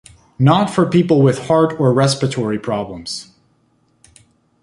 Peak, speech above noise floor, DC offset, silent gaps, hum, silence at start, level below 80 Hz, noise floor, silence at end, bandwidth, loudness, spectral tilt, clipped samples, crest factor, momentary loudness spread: 0 dBFS; 45 dB; under 0.1%; none; none; 0.4 s; -52 dBFS; -60 dBFS; 1.4 s; 11.5 kHz; -16 LUFS; -6.5 dB/octave; under 0.1%; 16 dB; 12 LU